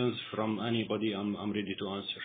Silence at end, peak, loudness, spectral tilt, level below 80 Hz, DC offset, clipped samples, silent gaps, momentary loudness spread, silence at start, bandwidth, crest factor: 0 s; -18 dBFS; -34 LUFS; -4.5 dB/octave; -76 dBFS; under 0.1%; under 0.1%; none; 5 LU; 0 s; 4.6 kHz; 16 dB